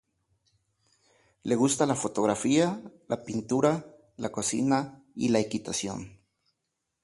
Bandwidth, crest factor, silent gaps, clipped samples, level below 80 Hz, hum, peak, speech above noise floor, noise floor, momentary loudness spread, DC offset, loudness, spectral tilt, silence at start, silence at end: 11.5 kHz; 20 dB; none; under 0.1%; -64 dBFS; none; -10 dBFS; 55 dB; -82 dBFS; 13 LU; under 0.1%; -28 LUFS; -4.5 dB/octave; 1.45 s; 0.95 s